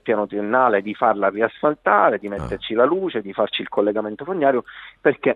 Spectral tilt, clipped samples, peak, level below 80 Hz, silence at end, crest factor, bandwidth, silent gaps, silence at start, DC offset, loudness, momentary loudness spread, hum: -7.5 dB/octave; under 0.1%; -2 dBFS; -50 dBFS; 0 s; 18 dB; 9.4 kHz; none; 0.05 s; under 0.1%; -20 LUFS; 9 LU; none